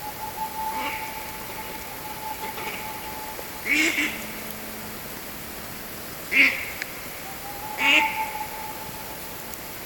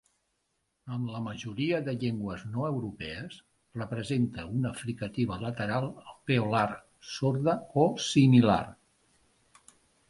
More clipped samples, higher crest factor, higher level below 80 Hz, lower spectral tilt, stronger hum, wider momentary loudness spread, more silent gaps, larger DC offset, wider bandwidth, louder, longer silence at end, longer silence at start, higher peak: neither; first, 26 dB vs 20 dB; first, -52 dBFS vs -58 dBFS; second, -2 dB/octave vs -6.5 dB/octave; neither; about the same, 15 LU vs 16 LU; neither; neither; first, 17.5 kHz vs 11.5 kHz; first, -26 LUFS vs -30 LUFS; second, 0 s vs 1.35 s; second, 0 s vs 0.85 s; first, -4 dBFS vs -10 dBFS